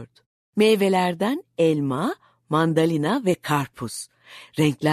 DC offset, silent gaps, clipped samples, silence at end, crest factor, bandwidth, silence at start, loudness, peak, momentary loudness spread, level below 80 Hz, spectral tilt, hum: under 0.1%; 0.26-0.53 s; under 0.1%; 0 s; 16 dB; 13.5 kHz; 0 s; -22 LUFS; -6 dBFS; 13 LU; -64 dBFS; -6 dB/octave; none